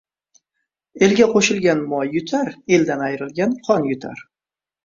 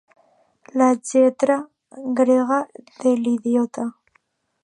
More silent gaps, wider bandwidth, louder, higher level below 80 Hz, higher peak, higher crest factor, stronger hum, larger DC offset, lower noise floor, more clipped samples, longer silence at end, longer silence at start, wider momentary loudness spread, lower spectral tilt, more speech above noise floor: neither; second, 7.8 kHz vs 10.5 kHz; about the same, -18 LUFS vs -20 LUFS; first, -60 dBFS vs -74 dBFS; about the same, -2 dBFS vs -4 dBFS; about the same, 18 dB vs 16 dB; neither; neither; first, under -90 dBFS vs -65 dBFS; neither; about the same, 0.65 s vs 0.75 s; first, 0.95 s vs 0.75 s; second, 10 LU vs 13 LU; about the same, -4.5 dB/octave vs -5 dB/octave; first, over 72 dB vs 46 dB